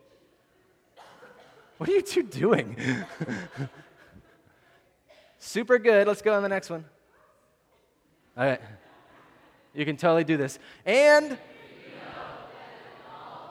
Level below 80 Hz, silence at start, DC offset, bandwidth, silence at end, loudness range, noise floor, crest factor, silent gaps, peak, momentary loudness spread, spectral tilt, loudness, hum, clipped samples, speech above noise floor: -70 dBFS; 1.8 s; under 0.1%; 15.5 kHz; 0 s; 7 LU; -66 dBFS; 22 dB; none; -6 dBFS; 25 LU; -5.5 dB/octave; -25 LUFS; none; under 0.1%; 42 dB